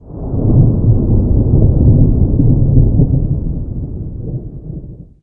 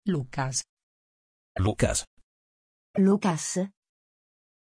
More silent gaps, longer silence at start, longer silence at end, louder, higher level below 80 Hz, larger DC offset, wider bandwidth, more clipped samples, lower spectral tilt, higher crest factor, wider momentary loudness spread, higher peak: second, none vs 0.69-0.77 s, 0.83-1.55 s, 2.07-2.17 s, 2.23-2.94 s; about the same, 0.05 s vs 0.05 s; second, 0.2 s vs 0.9 s; first, -13 LUFS vs -27 LUFS; first, -18 dBFS vs -48 dBFS; neither; second, 1.4 kHz vs 10.5 kHz; neither; first, -17 dB/octave vs -5 dB/octave; second, 12 dB vs 18 dB; first, 15 LU vs 12 LU; first, 0 dBFS vs -10 dBFS